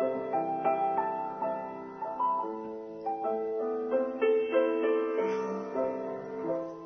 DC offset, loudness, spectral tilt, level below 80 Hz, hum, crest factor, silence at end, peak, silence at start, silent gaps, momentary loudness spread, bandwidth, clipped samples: under 0.1%; -31 LUFS; -7 dB/octave; -72 dBFS; none; 16 dB; 0 s; -14 dBFS; 0 s; none; 10 LU; 6.4 kHz; under 0.1%